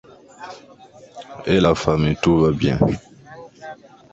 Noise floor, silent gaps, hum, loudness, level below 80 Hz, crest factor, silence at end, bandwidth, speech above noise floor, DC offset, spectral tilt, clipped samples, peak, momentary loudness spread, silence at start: -46 dBFS; none; none; -18 LUFS; -40 dBFS; 20 dB; 0.4 s; 8 kHz; 29 dB; under 0.1%; -7 dB/octave; under 0.1%; -2 dBFS; 23 LU; 0.4 s